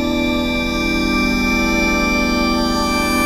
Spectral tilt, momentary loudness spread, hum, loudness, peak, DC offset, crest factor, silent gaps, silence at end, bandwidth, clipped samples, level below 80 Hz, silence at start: -4 dB/octave; 3 LU; none; -16 LUFS; -6 dBFS; under 0.1%; 12 dB; none; 0 s; 16 kHz; under 0.1%; -28 dBFS; 0 s